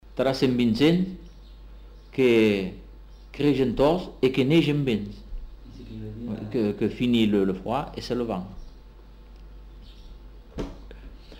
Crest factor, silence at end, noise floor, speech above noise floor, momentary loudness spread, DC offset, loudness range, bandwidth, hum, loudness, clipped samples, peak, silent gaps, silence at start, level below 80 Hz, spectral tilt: 16 dB; 0 s; -46 dBFS; 23 dB; 22 LU; under 0.1%; 10 LU; 16 kHz; none; -24 LUFS; under 0.1%; -8 dBFS; none; 0.05 s; -44 dBFS; -7 dB/octave